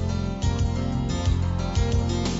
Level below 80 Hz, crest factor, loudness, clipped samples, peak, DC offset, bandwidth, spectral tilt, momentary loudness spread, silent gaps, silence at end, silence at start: -30 dBFS; 12 dB; -25 LUFS; under 0.1%; -12 dBFS; under 0.1%; 8 kHz; -6 dB/octave; 2 LU; none; 0 s; 0 s